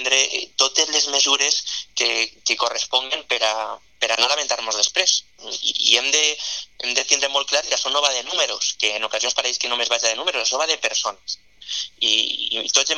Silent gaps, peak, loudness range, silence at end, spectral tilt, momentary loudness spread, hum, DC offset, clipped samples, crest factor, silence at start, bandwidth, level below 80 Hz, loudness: none; 0 dBFS; 2 LU; 0 s; 3 dB/octave; 10 LU; none; 0.2%; under 0.1%; 22 dB; 0 s; 16 kHz; -64 dBFS; -19 LUFS